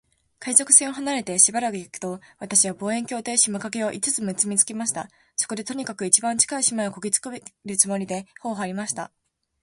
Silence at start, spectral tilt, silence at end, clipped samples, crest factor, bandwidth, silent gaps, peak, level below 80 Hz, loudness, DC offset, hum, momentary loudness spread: 0.4 s; -2 dB/octave; 0.55 s; under 0.1%; 24 dB; 12 kHz; none; 0 dBFS; -68 dBFS; -21 LUFS; under 0.1%; none; 15 LU